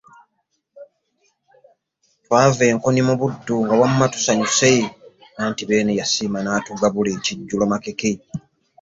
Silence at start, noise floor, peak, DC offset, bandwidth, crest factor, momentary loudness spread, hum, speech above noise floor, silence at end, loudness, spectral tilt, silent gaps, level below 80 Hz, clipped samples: 0.75 s; -72 dBFS; -2 dBFS; under 0.1%; 8 kHz; 18 dB; 9 LU; none; 53 dB; 0.45 s; -19 LUFS; -4.5 dB/octave; none; -56 dBFS; under 0.1%